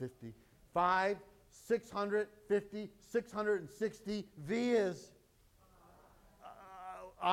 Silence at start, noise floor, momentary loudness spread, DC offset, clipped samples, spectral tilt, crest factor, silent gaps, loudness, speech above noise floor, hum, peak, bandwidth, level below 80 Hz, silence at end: 0 s; -68 dBFS; 21 LU; under 0.1%; under 0.1%; -5.5 dB/octave; 22 dB; none; -37 LUFS; 31 dB; none; -16 dBFS; 16 kHz; -70 dBFS; 0 s